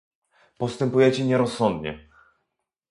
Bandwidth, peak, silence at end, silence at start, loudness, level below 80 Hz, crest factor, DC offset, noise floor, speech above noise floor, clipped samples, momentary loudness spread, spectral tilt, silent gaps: 11.5 kHz; -6 dBFS; 0.9 s; 0.6 s; -23 LUFS; -56 dBFS; 18 dB; under 0.1%; -80 dBFS; 58 dB; under 0.1%; 14 LU; -6.5 dB/octave; none